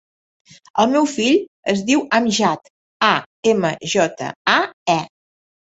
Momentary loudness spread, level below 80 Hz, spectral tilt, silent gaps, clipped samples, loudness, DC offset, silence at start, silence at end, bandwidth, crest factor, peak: 6 LU; -60 dBFS; -4 dB/octave; 1.48-1.63 s, 2.70-3.00 s, 3.26-3.43 s, 4.36-4.45 s, 4.73-4.86 s; under 0.1%; -18 LUFS; under 0.1%; 0.75 s; 0.7 s; 8.2 kHz; 18 dB; -2 dBFS